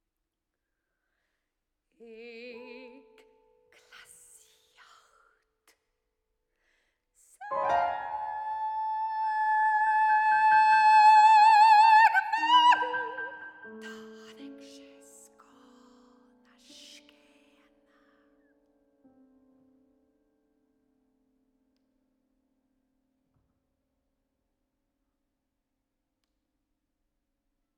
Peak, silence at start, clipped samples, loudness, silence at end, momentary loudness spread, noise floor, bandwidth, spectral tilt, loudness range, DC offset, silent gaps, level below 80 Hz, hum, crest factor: -10 dBFS; 2.2 s; under 0.1%; -22 LUFS; 13.25 s; 27 LU; -85 dBFS; 11 kHz; -1 dB/octave; 16 LU; under 0.1%; none; -78 dBFS; none; 18 dB